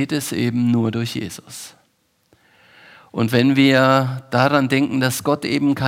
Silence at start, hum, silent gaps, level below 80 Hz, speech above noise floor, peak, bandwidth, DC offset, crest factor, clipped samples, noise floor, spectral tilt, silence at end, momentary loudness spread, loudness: 0 s; none; none; -62 dBFS; 46 dB; -2 dBFS; 16.5 kHz; under 0.1%; 18 dB; under 0.1%; -64 dBFS; -5.5 dB/octave; 0 s; 17 LU; -18 LUFS